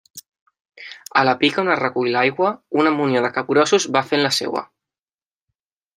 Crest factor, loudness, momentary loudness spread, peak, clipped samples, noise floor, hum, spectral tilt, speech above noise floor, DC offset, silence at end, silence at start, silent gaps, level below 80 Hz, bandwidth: 18 dB; -18 LUFS; 10 LU; -2 dBFS; under 0.1%; under -90 dBFS; none; -4 dB/octave; over 72 dB; under 0.1%; 1.3 s; 0.15 s; 0.28-0.32 s, 0.41-0.46 s, 0.60-0.65 s; -68 dBFS; 15.5 kHz